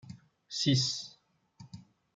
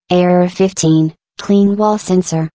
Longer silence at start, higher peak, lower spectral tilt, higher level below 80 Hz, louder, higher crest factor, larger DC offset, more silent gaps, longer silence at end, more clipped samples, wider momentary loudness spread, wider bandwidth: about the same, 0.05 s vs 0.1 s; second, -14 dBFS vs 0 dBFS; second, -4 dB/octave vs -6.5 dB/octave; second, -72 dBFS vs -54 dBFS; second, -30 LUFS vs -13 LUFS; first, 22 dB vs 12 dB; neither; neither; first, 0.35 s vs 0.05 s; neither; first, 25 LU vs 4 LU; first, 9.4 kHz vs 8 kHz